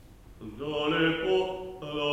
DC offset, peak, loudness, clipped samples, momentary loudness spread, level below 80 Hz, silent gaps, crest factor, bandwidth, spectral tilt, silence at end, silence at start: under 0.1%; -14 dBFS; -29 LUFS; under 0.1%; 16 LU; -54 dBFS; none; 16 dB; 14 kHz; -6 dB/octave; 0 s; 0 s